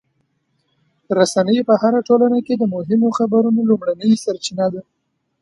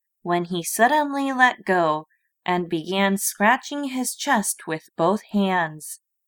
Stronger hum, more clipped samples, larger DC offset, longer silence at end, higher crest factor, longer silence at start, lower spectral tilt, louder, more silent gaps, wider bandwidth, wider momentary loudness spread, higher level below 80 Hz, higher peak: neither; neither; neither; first, 0.6 s vs 0.3 s; about the same, 16 dB vs 20 dB; first, 1.1 s vs 0.25 s; first, -6 dB/octave vs -3.5 dB/octave; first, -17 LUFS vs -22 LUFS; neither; second, 11.5 kHz vs 19.5 kHz; second, 7 LU vs 10 LU; first, -64 dBFS vs -70 dBFS; about the same, 0 dBFS vs -2 dBFS